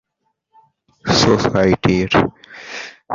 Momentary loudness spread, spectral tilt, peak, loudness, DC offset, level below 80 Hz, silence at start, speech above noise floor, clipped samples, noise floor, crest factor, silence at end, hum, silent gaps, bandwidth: 17 LU; -5 dB/octave; 0 dBFS; -15 LUFS; under 0.1%; -40 dBFS; 1.05 s; 55 dB; under 0.1%; -71 dBFS; 18 dB; 0 s; none; none; 7.8 kHz